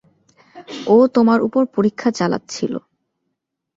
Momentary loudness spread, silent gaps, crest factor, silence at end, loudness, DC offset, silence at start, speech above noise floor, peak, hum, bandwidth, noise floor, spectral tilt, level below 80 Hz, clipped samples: 14 LU; none; 16 dB; 1 s; -17 LUFS; under 0.1%; 0.55 s; 60 dB; -2 dBFS; none; 7.8 kHz; -76 dBFS; -6 dB/octave; -62 dBFS; under 0.1%